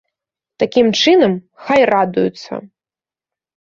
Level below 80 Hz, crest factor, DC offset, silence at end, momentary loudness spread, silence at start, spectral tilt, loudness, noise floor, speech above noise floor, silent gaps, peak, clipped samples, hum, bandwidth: -56 dBFS; 16 dB; under 0.1%; 1.1 s; 17 LU; 0.6 s; -5 dB/octave; -14 LUFS; under -90 dBFS; over 76 dB; none; -2 dBFS; under 0.1%; none; 7.6 kHz